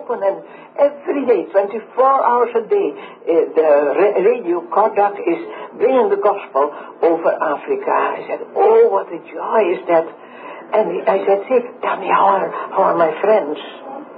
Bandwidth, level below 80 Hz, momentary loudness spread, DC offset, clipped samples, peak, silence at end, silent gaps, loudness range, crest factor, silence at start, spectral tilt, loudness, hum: 4.9 kHz; -80 dBFS; 12 LU; under 0.1%; under 0.1%; -2 dBFS; 0 s; none; 2 LU; 14 dB; 0 s; -10.5 dB/octave; -16 LUFS; none